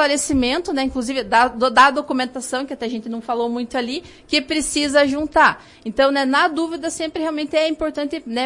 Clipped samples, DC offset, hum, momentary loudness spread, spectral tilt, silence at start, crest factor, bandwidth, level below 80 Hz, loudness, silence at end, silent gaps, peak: under 0.1%; under 0.1%; none; 11 LU; -2.5 dB/octave; 0 s; 18 dB; 11.5 kHz; -46 dBFS; -19 LUFS; 0 s; none; -2 dBFS